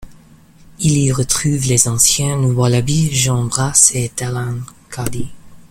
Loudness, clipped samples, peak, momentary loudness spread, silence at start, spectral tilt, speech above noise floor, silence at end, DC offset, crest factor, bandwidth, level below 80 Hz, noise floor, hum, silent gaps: -14 LUFS; under 0.1%; 0 dBFS; 15 LU; 0 s; -4 dB/octave; 29 dB; 0.05 s; under 0.1%; 16 dB; 17 kHz; -40 dBFS; -44 dBFS; none; none